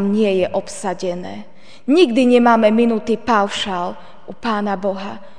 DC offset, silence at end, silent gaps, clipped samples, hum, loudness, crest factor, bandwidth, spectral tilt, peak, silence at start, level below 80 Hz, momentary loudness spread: 2%; 0.15 s; none; under 0.1%; none; -17 LUFS; 16 dB; 10 kHz; -5.5 dB/octave; -2 dBFS; 0 s; -56 dBFS; 16 LU